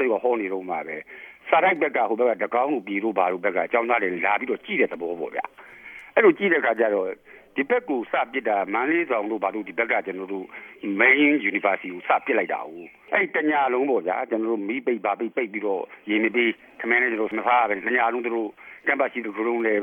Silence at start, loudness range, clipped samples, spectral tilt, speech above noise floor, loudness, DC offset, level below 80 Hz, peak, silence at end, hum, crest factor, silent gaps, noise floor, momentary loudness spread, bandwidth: 0 s; 3 LU; under 0.1%; -7 dB/octave; 20 dB; -23 LUFS; under 0.1%; -74 dBFS; -4 dBFS; 0 s; none; 20 dB; none; -44 dBFS; 12 LU; 3.7 kHz